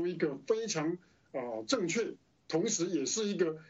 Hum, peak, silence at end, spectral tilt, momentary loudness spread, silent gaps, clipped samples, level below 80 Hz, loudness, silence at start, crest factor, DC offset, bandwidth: none; -16 dBFS; 0.05 s; -3.5 dB/octave; 9 LU; none; under 0.1%; -80 dBFS; -34 LUFS; 0 s; 18 dB; under 0.1%; 8.2 kHz